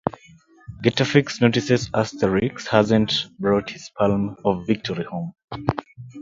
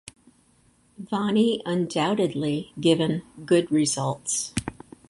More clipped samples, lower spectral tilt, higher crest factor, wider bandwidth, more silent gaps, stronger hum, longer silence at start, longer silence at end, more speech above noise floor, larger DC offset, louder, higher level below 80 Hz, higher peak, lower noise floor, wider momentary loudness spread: neither; first, -6 dB/octave vs -4.5 dB/octave; about the same, 22 dB vs 20 dB; second, 7.6 kHz vs 11.5 kHz; first, 5.44-5.48 s vs none; neither; second, 0.05 s vs 1 s; second, 0 s vs 0.35 s; second, 30 dB vs 37 dB; neither; about the same, -22 LUFS vs -24 LUFS; first, -50 dBFS vs -56 dBFS; first, 0 dBFS vs -6 dBFS; second, -51 dBFS vs -61 dBFS; about the same, 12 LU vs 10 LU